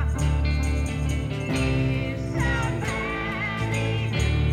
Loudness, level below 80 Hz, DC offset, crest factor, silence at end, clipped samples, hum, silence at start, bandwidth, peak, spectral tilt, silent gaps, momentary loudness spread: -25 LUFS; -30 dBFS; under 0.1%; 12 dB; 0 s; under 0.1%; none; 0 s; 13 kHz; -12 dBFS; -6 dB/octave; none; 3 LU